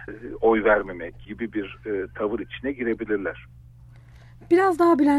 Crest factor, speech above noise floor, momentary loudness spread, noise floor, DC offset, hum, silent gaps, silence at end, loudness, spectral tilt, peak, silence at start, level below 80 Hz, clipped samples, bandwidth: 18 dB; 24 dB; 16 LU; -47 dBFS; under 0.1%; none; none; 0 s; -24 LUFS; -7 dB/octave; -6 dBFS; 0 s; -48 dBFS; under 0.1%; 11.5 kHz